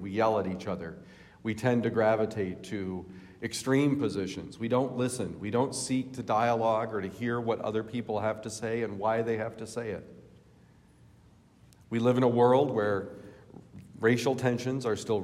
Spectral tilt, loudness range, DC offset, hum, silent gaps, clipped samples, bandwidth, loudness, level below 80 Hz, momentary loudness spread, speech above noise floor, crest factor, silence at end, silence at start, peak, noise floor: -6 dB/octave; 6 LU; under 0.1%; none; none; under 0.1%; 15 kHz; -30 LUFS; -66 dBFS; 13 LU; 30 dB; 18 dB; 0 s; 0 s; -12 dBFS; -59 dBFS